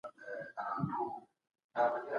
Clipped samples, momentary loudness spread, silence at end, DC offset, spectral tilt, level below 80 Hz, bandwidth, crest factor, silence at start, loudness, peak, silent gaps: under 0.1%; 12 LU; 0 s; under 0.1%; -8.5 dB/octave; -74 dBFS; 9.8 kHz; 18 dB; 0.05 s; -38 LUFS; -20 dBFS; 1.64-1.69 s